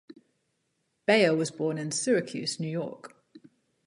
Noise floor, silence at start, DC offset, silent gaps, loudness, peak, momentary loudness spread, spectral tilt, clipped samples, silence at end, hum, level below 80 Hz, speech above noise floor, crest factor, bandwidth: -77 dBFS; 0.1 s; under 0.1%; none; -27 LUFS; -8 dBFS; 12 LU; -4 dB/octave; under 0.1%; 0.5 s; none; -78 dBFS; 49 dB; 22 dB; 11.5 kHz